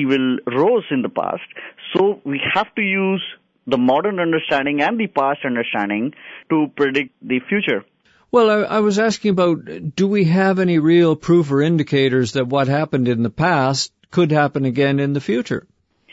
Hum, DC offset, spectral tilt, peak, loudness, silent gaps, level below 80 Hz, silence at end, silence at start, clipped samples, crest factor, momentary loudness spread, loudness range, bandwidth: none; under 0.1%; -6 dB/octave; -2 dBFS; -18 LUFS; none; -58 dBFS; 0.55 s; 0 s; under 0.1%; 16 dB; 8 LU; 4 LU; 8 kHz